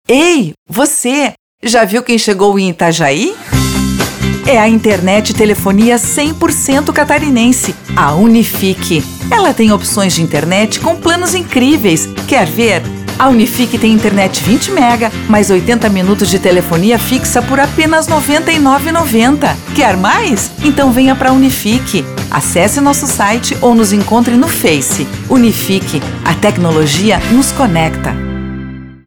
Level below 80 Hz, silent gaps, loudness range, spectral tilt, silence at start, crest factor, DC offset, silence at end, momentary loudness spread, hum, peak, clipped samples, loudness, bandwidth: -32 dBFS; 0.58-0.66 s, 1.39-1.58 s; 1 LU; -4.5 dB/octave; 0.1 s; 10 dB; under 0.1%; 0.1 s; 6 LU; none; 0 dBFS; under 0.1%; -10 LUFS; over 20 kHz